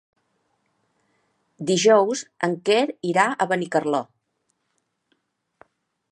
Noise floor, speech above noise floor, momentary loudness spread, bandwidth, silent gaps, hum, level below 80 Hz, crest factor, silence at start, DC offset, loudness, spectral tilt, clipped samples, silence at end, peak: -74 dBFS; 53 dB; 10 LU; 11.5 kHz; none; none; -78 dBFS; 22 dB; 1.6 s; under 0.1%; -21 LUFS; -4 dB/octave; under 0.1%; 2.1 s; -2 dBFS